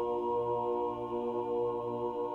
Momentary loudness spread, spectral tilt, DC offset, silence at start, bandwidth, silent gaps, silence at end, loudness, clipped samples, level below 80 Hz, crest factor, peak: 3 LU; -9 dB/octave; under 0.1%; 0 s; 4.2 kHz; none; 0 s; -34 LUFS; under 0.1%; -64 dBFS; 10 dB; -22 dBFS